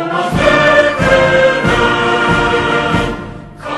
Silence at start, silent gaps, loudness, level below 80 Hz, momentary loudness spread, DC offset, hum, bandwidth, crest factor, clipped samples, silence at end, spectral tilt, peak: 0 s; none; -11 LUFS; -30 dBFS; 10 LU; under 0.1%; none; 12.5 kHz; 12 dB; under 0.1%; 0 s; -5 dB/octave; 0 dBFS